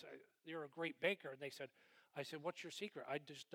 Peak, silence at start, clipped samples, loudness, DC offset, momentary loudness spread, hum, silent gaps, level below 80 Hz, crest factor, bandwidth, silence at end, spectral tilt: -26 dBFS; 0 s; under 0.1%; -48 LUFS; under 0.1%; 14 LU; none; none; under -90 dBFS; 22 dB; 18 kHz; 0 s; -4 dB/octave